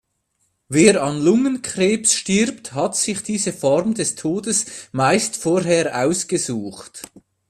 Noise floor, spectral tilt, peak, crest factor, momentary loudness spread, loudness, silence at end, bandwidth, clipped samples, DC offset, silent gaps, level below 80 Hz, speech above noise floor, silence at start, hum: -69 dBFS; -4 dB/octave; 0 dBFS; 20 dB; 10 LU; -19 LUFS; 0.45 s; 15 kHz; under 0.1%; under 0.1%; none; -58 dBFS; 50 dB; 0.7 s; none